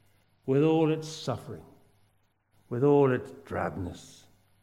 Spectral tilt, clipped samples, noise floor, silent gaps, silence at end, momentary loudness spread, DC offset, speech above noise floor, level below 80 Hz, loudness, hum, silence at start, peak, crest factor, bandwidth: -7 dB/octave; under 0.1%; -69 dBFS; none; 0.55 s; 18 LU; under 0.1%; 42 dB; -62 dBFS; -28 LUFS; none; 0.45 s; -12 dBFS; 18 dB; 12.5 kHz